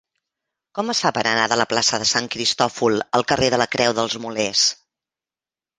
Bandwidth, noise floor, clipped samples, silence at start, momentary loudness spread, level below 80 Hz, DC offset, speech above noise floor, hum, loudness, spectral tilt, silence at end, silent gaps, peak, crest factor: 10.5 kHz; under -90 dBFS; under 0.1%; 0.75 s; 6 LU; -54 dBFS; under 0.1%; over 70 dB; none; -19 LUFS; -2.5 dB/octave; 1.05 s; none; 0 dBFS; 20 dB